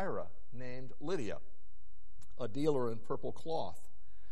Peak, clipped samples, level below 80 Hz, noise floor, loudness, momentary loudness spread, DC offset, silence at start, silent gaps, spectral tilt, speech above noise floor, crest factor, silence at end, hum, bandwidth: -18 dBFS; under 0.1%; -62 dBFS; -62 dBFS; -40 LUFS; 16 LU; 3%; 0 s; none; -6.5 dB/octave; 24 dB; 20 dB; 0.05 s; none; 11.5 kHz